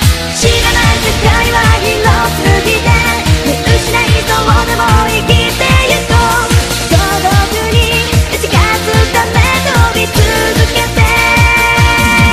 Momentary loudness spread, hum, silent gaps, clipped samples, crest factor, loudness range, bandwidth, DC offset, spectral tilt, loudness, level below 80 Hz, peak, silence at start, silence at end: 4 LU; none; none; 0.2%; 10 dB; 1 LU; 16 kHz; under 0.1%; -4 dB/octave; -9 LUFS; -16 dBFS; 0 dBFS; 0 s; 0 s